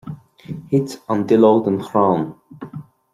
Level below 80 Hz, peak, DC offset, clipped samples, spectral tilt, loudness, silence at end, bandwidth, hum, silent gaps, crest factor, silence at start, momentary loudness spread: -60 dBFS; -2 dBFS; under 0.1%; under 0.1%; -8 dB/octave; -17 LUFS; 0.3 s; 14.5 kHz; none; none; 16 dB; 0.05 s; 23 LU